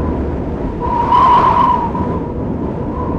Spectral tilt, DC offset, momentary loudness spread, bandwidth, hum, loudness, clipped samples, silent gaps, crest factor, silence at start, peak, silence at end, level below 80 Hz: -8.5 dB/octave; under 0.1%; 11 LU; 7.4 kHz; none; -14 LUFS; under 0.1%; none; 12 dB; 0 s; -2 dBFS; 0 s; -26 dBFS